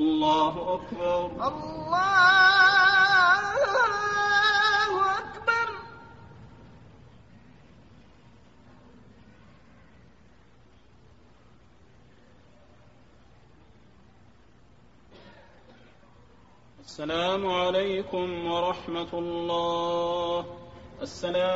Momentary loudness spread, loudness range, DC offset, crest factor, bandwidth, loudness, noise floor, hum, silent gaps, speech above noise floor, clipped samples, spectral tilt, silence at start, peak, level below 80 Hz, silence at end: 16 LU; 14 LU; 0.1%; 20 dB; 8 kHz; -24 LUFS; -58 dBFS; none; none; 32 dB; under 0.1%; -3.5 dB/octave; 0 s; -8 dBFS; -58 dBFS; 0 s